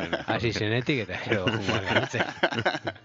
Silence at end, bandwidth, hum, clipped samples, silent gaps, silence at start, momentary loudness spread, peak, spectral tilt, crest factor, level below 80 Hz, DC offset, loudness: 0.05 s; 7.8 kHz; none; under 0.1%; none; 0 s; 4 LU; -6 dBFS; -5 dB/octave; 20 dB; -56 dBFS; under 0.1%; -27 LUFS